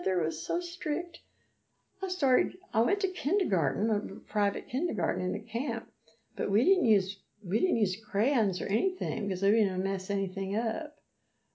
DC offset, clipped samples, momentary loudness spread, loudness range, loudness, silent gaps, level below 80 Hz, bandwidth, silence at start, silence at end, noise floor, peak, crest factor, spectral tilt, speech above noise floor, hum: under 0.1%; under 0.1%; 8 LU; 2 LU; -30 LUFS; none; -78 dBFS; 8 kHz; 0 s; 0.65 s; -77 dBFS; -12 dBFS; 18 dB; -6 dB/octave; 48 dB; none